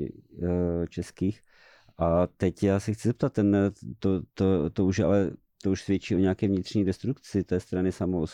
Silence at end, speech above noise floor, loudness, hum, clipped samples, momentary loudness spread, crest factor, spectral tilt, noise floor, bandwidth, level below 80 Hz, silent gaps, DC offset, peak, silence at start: 0 s; 31 dB; -27 LUFS; none; under 0.1%; 7 LU; 14 dB; -7.5 dB/octave; -57 dBFS; 11.5 kHz; -50 dBFS; none; under 0.1%; -14 dBFS; 0 s